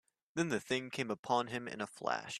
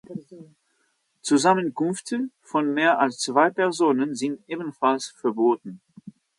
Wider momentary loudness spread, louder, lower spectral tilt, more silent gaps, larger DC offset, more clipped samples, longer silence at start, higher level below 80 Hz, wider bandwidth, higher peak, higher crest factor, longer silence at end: second, 6 LU vs 13 LU; second, -38 LUFS vs -23 LUFS; about the same, -4 dB/octave vs -4.5 dB/octave; first, 1.19-1.23 s vs none; neither; neither; first, 0.35 s vs 0.1 s; about the same, -76 dBFS vs -76 dBFS; first, 13.5 kHz vs 11.5 kHz; second, -18 dBFS vs -6 dBFS; about the same, 20 dB vs 20 dB; second, 0 s vs 0.3 s